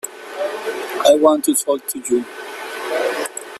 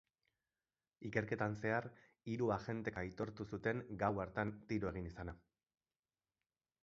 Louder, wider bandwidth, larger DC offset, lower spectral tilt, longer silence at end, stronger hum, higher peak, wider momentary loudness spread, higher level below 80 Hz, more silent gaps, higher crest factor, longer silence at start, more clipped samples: first, -18 LUFS vs -42 LUFS; first, 15 kHz vs 7.4 kHz; neither; second, -1.5 dB/octave vs -6.5 dB/octave; second, 0 s vs 1.45 s; neither; first, 0 dBFS vs -20 dBFS; first, 16 LU vs 12 LU; about the same, -66 dBFS vs -64 dBFS; neither; second, 18 dB vs 24 dB; second, 0.05 s vs 1 s; neither